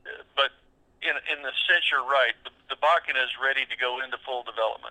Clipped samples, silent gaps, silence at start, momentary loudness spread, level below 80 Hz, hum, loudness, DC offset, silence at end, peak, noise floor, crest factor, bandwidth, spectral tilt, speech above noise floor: under 0.1%; none; 0.05 s; 11 LU; -68 dBFS; none; -25 LUFS; under 0.1%; 0 s; -8 dBFS; -61 dBFS; 18 dB; 10 kHz; -1 dB/octave; 34 dB